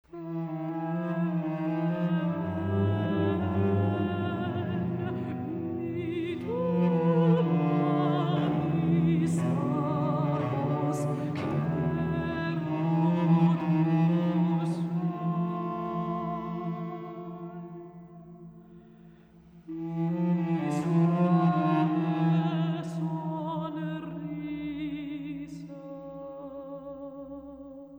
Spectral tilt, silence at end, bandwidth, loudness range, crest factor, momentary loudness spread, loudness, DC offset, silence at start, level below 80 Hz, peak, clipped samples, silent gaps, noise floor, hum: -9 dB/octave; 0 s; 9.2 kHz; 11 LU; 16 dB; 17 LU; -29 LUFS; under 0.1%; 0.15 s; -60 dBFS; -14 dBFS; under 0.1%; none; -54 dBFS; none